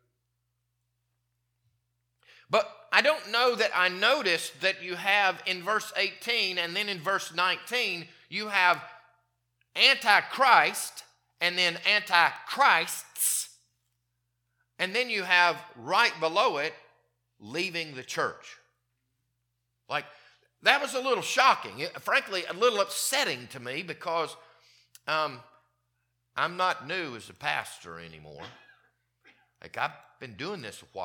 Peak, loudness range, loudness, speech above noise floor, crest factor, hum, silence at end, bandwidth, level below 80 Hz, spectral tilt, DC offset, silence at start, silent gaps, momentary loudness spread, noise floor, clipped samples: -4 dBFS; 10 LU; -26 LUFS; 52 dB; 26 dB; 60 Hz at -75 dBFS; 0 s; 19 kHz; -80 dBFS; -1.5 dB/octave; under 0.1%; 2.5 s; none; 15 LU; -79 dBFS; under 0.1%